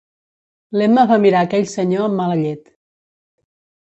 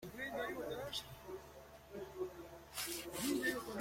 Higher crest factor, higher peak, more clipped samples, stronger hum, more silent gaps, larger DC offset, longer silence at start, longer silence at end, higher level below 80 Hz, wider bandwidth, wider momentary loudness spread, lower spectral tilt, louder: second, 16 dB vs 22 dB; first, -2 dBFS vs -24 dBFS; neither; neither; neither; neither; first, 0.7 s vs 0 s; first, 1.3 s vs 0 s; about the same, -62 dBFS vs -66 dBFS; second, 8.2 kHz vs 16.5 kHz; second, 11 LU vs 15 LU; first, -7 dB/octave vs -3 dB/octave; first, -16 LUFS vs -43 LUFS